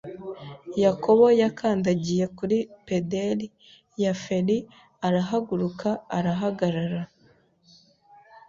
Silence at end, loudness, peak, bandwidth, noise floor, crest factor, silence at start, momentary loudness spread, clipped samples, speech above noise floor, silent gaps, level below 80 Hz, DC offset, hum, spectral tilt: 1.45 s; -25 LUFS; -6 dBFS; 7.6 kHz; -61 dBFS; 18 dB; 0.05 s; 15 LU; under 0.1%; 37 dB; none; -62 dBFS; under 0.1%; none; -7 dB/octave